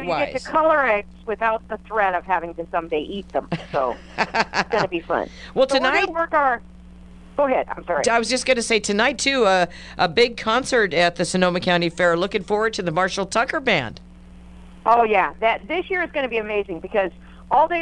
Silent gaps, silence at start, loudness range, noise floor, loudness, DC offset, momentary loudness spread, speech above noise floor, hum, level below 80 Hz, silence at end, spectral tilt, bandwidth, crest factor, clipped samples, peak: none; 0 s; 5 LU; -42 dBFS; -21 LUFS; under 0.1%; 9 LU; 22 dB; none; -46 dBFS; 0 s; -3.5 dB/octave; 11 kHz; 20 dB; under 0.1%; -2 dBFS